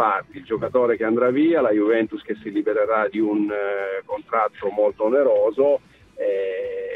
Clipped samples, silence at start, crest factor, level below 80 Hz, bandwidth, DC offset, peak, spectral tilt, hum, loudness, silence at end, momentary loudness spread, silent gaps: under 0.1%; 0 s; 14 dB; -62 dBFS; 4.2 kHz; under 0.1%; -6 dBFS; -8 dB/octave; none; -21 LUFS; 0 s; 9 LU; none